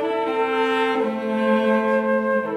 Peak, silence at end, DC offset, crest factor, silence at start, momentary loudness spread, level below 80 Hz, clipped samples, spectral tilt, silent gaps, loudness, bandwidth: -8 dBFS; 0 s; under 0.1%; 12 dB; 0 s; 4 LU; -76 dBFS; under 0.1%; -6 dB/octave; none; -21 LUFS; 11.5 kHz